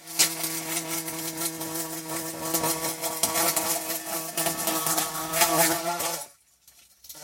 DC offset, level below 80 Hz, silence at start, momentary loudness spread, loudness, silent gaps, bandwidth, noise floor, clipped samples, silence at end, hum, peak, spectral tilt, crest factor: under 0.1%; -62 dBFS; 0 s; 9 LU; -26 LUFS; none; 17 kHz; -58 dBFS; under 0.1%; 0 s; none; -4 dBFS; -1.5 dB/octave; 24 dB